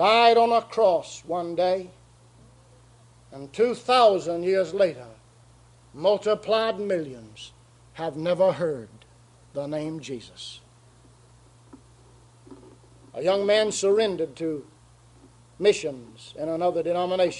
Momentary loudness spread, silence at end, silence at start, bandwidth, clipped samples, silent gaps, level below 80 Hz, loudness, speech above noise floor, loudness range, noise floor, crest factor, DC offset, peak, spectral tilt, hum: 20 LU; 0 s; 0 s; 11.5 kHz; under 0.1%; none; -62 dBFS; -24 LUFS; 31 dB; 13 LU; -54 dBFS; 20 dB; under 0.1%; -6 dBFS; -4 dB/octave; none